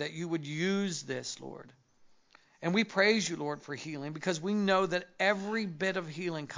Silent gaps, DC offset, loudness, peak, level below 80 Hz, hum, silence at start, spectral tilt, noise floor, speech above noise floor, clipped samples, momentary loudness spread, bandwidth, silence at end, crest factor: none; under 0.1%; -32 LUFS; -12 dBFS; -78 dBFS; none; 0 s; -4.5 dB/octave; -63 dBFS; 31 dB; under 0.1%; 13 LU; 7.6 kHz; 0 s; 20 dB